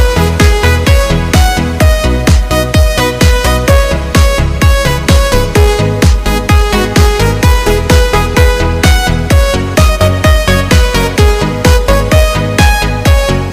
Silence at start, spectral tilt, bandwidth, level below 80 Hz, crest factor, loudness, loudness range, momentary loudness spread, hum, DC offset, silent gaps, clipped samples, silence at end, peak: 0 s; -5 dB/octave; 16.5 kHz; -12 dBFS; 8 dB; -9 LUFS; 0 LU; 2 LU; none; 0.3%; none; under 0.1%; 0 s; 0 dBFS